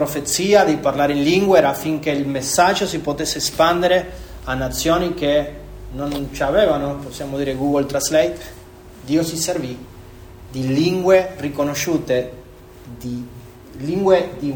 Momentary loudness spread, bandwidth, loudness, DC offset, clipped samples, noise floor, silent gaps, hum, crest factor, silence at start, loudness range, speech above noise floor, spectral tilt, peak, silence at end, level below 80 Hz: 18 LU; over 20 kHz; -18 LUFS; under 0.1%; under 0.1%; -40 dBFS; none; none; 18 dB; 0 s; 5 LU; 22 dB; -4.5 dB/octave; 0 dBFS; 0 s; -40 dBFS